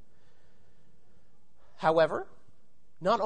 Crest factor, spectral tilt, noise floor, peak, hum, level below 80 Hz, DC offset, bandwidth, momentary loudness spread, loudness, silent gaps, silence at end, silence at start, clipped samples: 20 dB; -6 dB/octave; -70 dBFS; -12 dBFS; none; -68 dBFS; 0.7%; 9.6 kHz; 14 LU; -29 LUFS; none; 0 s; 1.8 s; under 0.1%